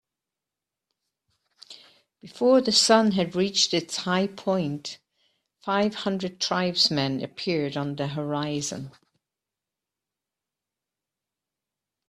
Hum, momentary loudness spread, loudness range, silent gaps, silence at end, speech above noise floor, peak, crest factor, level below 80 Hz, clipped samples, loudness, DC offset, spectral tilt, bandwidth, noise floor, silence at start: none; 13 LU; 11 LU; none; 3.2 s; 64 dB; -4 dBFS; 24 dB; -68 dBFS; under 0.1%; -24 LUFS; under 0.1%; -4 dB/octave; 14 kHz; -88 dBFS; 1.7 s